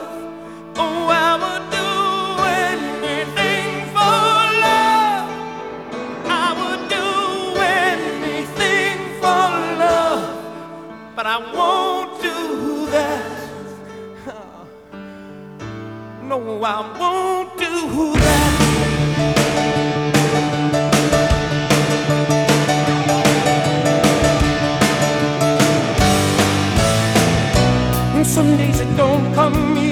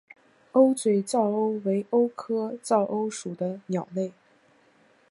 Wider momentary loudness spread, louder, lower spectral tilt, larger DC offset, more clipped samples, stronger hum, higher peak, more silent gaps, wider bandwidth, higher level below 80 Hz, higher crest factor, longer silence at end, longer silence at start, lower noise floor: first, 16 LU vs 11 LU; first, -17 LUFS vs -26 LUFS; second, -4.5 dB/octave vs -6.5 dB/octave; first, 0.1% vs under 0.1%; neither; neither; first, -2 dBFS vs -8 dBFS; neither; first, 19 kHz vs 11.5 kHz; first, -34 dBFS vs -76 dBFS; about the same, 16 dB vs 20 dB; second, 0 s vs 1 s; second, 0 s vs 0.55 s; second, -39 dBFS vs -61 dBFS